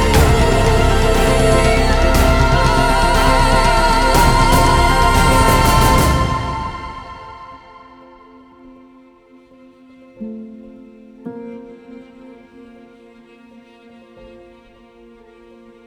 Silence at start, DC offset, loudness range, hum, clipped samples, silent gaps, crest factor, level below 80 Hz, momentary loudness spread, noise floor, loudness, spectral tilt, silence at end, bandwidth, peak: 0 s; under 0.1%; 23 LU; none; under 0.1%; none; 16 dB; -20 dBFS; 21 LU; -46 dBFS; -13 LUFS; -5 dB/octave; 3.9 s; over 20 kHz; 0 dBFS